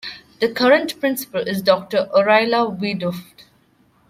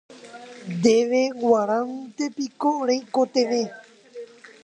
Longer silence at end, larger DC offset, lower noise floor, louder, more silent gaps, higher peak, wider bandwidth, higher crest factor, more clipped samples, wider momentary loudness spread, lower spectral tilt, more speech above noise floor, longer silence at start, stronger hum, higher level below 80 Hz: first, 0.9 s vs 0.4 s; neither; first, -58 dBFS vs -42 dBFS; first, -18 LUFS vs -23 LUFS; neither; about the same, -2 dBFS vs -4 dBFS; first, 16 kHz vs 10 kHz; about the same, 18 dB vs 20 dB; neither; second, 10 LU vs 22 LU; about the same, -4.5 dB/octave vs -5 dB/octave; first, 39 dB vs 19 dB; about the same, 0.05 s vs 0.1 s; neither; first, -62 dBFS vs -70 dBFS